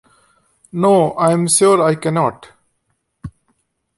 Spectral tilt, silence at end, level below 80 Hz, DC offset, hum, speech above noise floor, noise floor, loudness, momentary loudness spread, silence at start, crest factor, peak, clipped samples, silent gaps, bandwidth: -5 dB/octave; 0.7 s; -52 dBFS; under 0.1%; none; 55 dB; -69 dBFS; -14 LUFS; 25 LU; 0.75 s; 16 dB; -2 dBFS; under 0.1%; none; 12 kHz